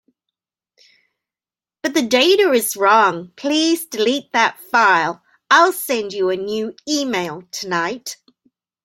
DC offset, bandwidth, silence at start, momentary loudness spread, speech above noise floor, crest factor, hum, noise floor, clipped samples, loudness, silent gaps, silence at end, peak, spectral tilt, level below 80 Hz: under 0.1%; 16.5 kHz; 1.85 s; 13 LU; over 73 dB; 18 dB; none; under -90 dBFS; under 0.1%; -17 LUFS; none; 0.7 s; 0 dBFS; -2.5 dB/octave; -68 dBFS